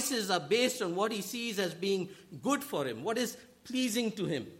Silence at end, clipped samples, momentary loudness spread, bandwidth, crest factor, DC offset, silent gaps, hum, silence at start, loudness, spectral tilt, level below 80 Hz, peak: 0 s; under 0.1%; 8 LU; 16.5 kHz; 18 dB; under 0.1%; none; none; 0 s; -33 LUFS; -3.5 dB/octave; -76 dBFS; -16 dBFS